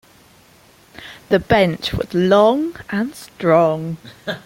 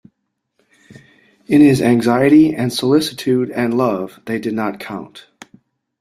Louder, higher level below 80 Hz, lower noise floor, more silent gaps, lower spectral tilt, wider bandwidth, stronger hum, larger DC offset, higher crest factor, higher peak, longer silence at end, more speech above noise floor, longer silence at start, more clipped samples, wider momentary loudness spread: about the same, -17 LUFS vs -15 LUFS; first, -44 dBFS vs -54 dBFS; second, -50 dBFS vs -72 dBFS; neither; about the same, -6.5 dB/octave vs -6 dB/octave; first, 16.5 kHz vs 14.5 kHz; neither; neither; about the same, 18 dB vs 16 dB; about the same, -2 dBFS vs -2 dBFS; second, 0.05 s vs 0.8 s; second, 33 dB vs 58 dB; second, 1 s vs 1.5 s; neither; first, 16 LU vs 13 LU